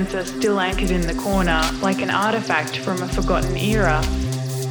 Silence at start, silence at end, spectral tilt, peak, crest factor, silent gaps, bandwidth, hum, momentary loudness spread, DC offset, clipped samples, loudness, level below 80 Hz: 0 s; 0 s; -5 dB/octave; -4 dBFS; 16 dB; none; over 20 kHz; none; 5 LU; under 0.1%; under 0.1%; -21 LUFS; -28 dBFS